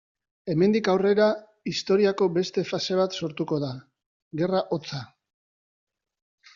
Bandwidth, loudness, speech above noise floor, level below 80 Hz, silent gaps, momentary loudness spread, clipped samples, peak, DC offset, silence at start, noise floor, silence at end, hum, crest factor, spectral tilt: 7.4 kHz; -25 LUFS; over 66 dB; -68 dBFS; 4.06-4.31 s; 14 LU; under 0.1%; -8 dBFS; under 0.1%; 0.45 s; under -90 dBFS; 1.5 s; none; 18 dB; -5 dB/octave